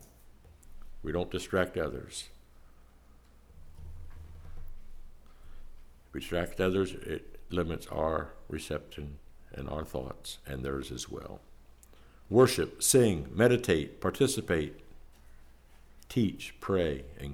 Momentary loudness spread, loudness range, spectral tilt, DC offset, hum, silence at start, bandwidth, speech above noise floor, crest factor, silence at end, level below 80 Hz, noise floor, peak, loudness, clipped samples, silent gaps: 25 LU; 13 LU; -4.5 dB/octave; under 0.1%; none; 0 s; 17.5 kHz; 26 dB; 22 dB; 0 s; -48 dBFS; -57 dBFS; -12 dBFS; -31 LUFS; under 0.1%; none